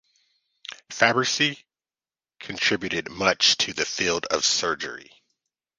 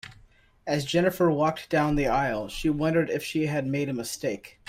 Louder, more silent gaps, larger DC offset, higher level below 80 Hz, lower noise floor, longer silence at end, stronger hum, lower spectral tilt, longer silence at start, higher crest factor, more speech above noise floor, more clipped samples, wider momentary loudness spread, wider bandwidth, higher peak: first, -22 LUFS vs -26 LUFS; neither; neither; second, -60 dBFS vs -46 dBFS; first, under -90 dBFS vs -57 dBFS; first, 0.75 s vs 0.2 s; neither; second, -1.5 dB/octave vs -5.5 dB/octave; first, 0.7 s vs 0.05 s; first, 24 dB vs 16 dB; first, over 66 dB vs 31 dB; neither; first, 21 LU vs 7 LU; second, 10.5 kHz vs 16 kHz; first, -2 dBFS vs -10 dBFS